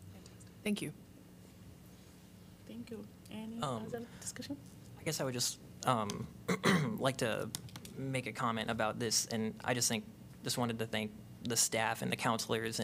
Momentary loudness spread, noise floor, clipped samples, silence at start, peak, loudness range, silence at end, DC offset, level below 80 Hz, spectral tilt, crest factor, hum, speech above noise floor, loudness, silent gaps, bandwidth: 24 LU; -57 dBFS; under 0.1%; 0 s; -14 dBFS; 11 LU; 0 s; under 0.1%; -66 dBFS; -3.5 dB/octave; 24 dB; none; 20 dB; -36 LUFS; none; 16 kHz